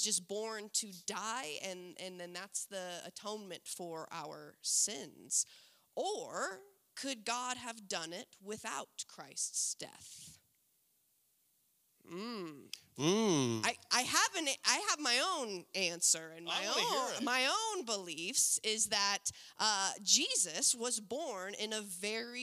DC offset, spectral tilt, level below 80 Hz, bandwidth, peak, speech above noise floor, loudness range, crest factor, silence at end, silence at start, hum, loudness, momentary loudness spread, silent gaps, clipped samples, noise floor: under 0.1%; -1 dB/octave; -86 dBFS; 16 kHz; -12 dBFS; 38 dB; 11 LU; 26 dB; 0 s; 0 s; none; -35 LUFS; 15 LU; none; under 0.1%; -76 dBFS